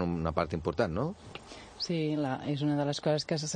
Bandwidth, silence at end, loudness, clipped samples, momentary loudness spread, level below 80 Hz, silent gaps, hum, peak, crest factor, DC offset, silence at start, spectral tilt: 9.8 kHz; 0 s; -32 LUFS; under 0.1%; 15 LU; -52 dBFS; none; none; -12 dBFS; 20 dB; under 0.1%; 0 s; -5.5 dB/octave